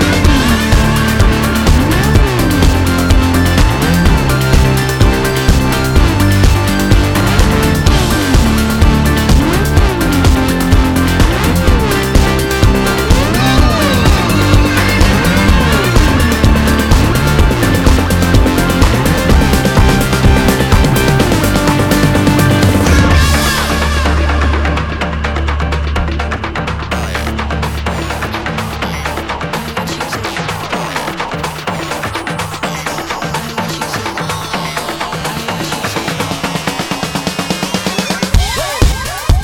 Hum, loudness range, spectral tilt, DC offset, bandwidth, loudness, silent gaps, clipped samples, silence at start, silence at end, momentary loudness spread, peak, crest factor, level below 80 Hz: none; 8 LU; -5 dB/octave; under 0.1%; 19 kHz; -12 LUFS; none; under 0.1%; 0 s; 0 s; 8 LU; 0 dBFS; 10 dB; -16 dBFS